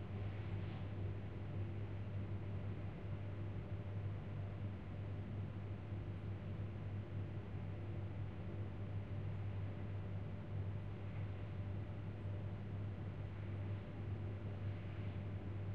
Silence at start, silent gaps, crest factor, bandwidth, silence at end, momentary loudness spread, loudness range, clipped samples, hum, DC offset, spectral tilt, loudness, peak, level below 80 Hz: 0 s; none; 12 dB; 4.6 kHz; 0 s; 2 LU; 1 LU; under 0.1%; none; 0.2%; -9.5 dB/octave; -47 LUFS; -34 dBFS; -58 dBFS